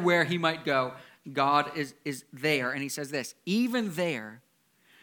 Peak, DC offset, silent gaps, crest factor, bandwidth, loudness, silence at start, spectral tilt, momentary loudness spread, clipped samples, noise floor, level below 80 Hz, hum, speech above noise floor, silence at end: -10 dBFS; under 0.1%; none; 20 dB; 19 kHz; -29 LUFS; 0 s; -4.5 dB/octave; 12 LU; under 0.1%; -65 dBFS; -78 dBFS; none; 36 dB; 0.65 s